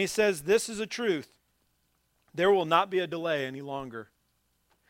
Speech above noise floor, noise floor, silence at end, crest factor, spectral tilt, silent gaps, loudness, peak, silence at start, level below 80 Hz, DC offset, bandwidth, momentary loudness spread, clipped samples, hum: 45 dB; -73 dBFS; 0.85 s; 22 dB; -4 dB/octave; none; -28 LUFS; -8 dBFS; 0 s; -68 dBFS; under 0.1%; 16 kHz; 13 LU; under 0.1%; none